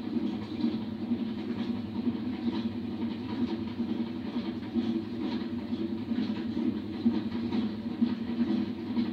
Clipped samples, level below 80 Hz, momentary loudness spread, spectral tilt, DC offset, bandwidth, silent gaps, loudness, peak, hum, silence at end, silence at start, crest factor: under 0.1%; -64 dBFS; 4 LU; -8 dB/octave; under 0.1%; 6 kHz; none; -33 LUFS; -16 dBFS; none; 0 s; 0 s; 16 dB